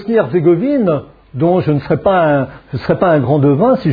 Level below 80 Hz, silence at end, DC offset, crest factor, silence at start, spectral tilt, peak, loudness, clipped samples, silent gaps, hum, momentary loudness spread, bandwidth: -44 dBFS; 0 s; under 0.1%; 12 dB; 0 s; -11 dB/octave; 0 dBFS; -13 LUFS; under 0.1%; none; none; 8 LU; 5 kHz